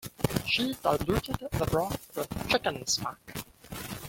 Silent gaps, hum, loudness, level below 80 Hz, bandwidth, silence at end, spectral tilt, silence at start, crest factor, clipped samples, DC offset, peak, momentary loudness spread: none; none; -30 LUFS; -48 dBFS; 17 kHz; 0 s; -4 dB/octave; 0 s; 22 dB; under 0.1%; under 0.1%; -8 dBFS; 14 LU